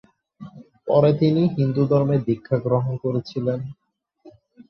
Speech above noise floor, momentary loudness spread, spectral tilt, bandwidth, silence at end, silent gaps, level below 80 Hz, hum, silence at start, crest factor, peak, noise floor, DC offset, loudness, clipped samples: 34 dB; 17 LU; -10 dB/octave; 6.2 kHz; 0.1 s; none; -58 dBFS; none; 0.4 s; 16 dB; -6 dBFS; -54 dBFS; under 0.1%; -21 LUFS; under 0.1%